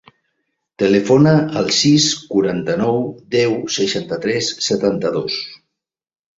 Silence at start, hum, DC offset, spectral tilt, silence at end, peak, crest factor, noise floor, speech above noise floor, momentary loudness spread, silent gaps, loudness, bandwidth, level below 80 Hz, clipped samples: 0.8 s; none; under 0.1%; -4.5 dB/octave; 0.85 s; 0 dBFS; 16 dB; -78 dBFS; 62 dB; 9 LU; none; -16 LUFS; 7.8 kHz; -54 dBFS; under 0.1%